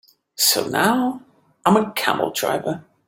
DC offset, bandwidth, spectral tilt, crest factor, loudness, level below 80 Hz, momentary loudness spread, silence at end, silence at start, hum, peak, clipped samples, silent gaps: under 0.1%; 16.5 kHz; -3 dB/octave; 20 dB; -20 LUFS; -62 dBFS; 10 LU; 0.25 s; 0.4 s; none; -2 dBFS; under 0.1%; none